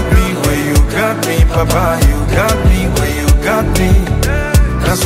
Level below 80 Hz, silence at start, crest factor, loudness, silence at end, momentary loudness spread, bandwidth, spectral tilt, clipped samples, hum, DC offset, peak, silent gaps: -14 dBFS; 0 s; 10 dB; -13 LUFS; 0 s; 3 LU; 16.5 kHz; -5.5 dB/octave; under 0.1%; none; under 0.1%; 0 dBFS; none